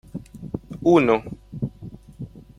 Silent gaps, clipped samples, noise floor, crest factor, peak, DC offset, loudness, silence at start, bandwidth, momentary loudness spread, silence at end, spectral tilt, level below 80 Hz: none; under 0.1%; -41 dBFS; 20 dB; -4 dBFS; under 0.1%; -21 LUFS; 0.15 s; 11 kHz; 22 LU; 0.2 s; -7.5 dB/octave; -48 dBFS